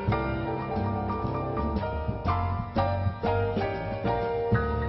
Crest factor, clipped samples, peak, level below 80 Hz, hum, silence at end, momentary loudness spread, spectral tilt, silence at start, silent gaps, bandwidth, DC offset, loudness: 16 dB; under 0.1%; -12 dBFS; -38 dBFS; none; 0 s; 4 LU; -10 dB/octave; 0 s; none; 5.8 kHz; under 0.1%; -29 LUFS